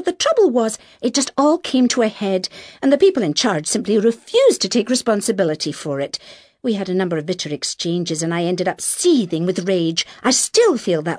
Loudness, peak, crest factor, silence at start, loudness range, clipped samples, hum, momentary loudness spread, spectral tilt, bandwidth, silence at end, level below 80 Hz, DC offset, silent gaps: -18 LUFS; -2 dBFS; 16 dB; 0 s; 5 LU; under 0.1%; none; 9 LU; -4 dB/octave; 11 kHz; 0 s; -62 dBFS; under 0.1%; none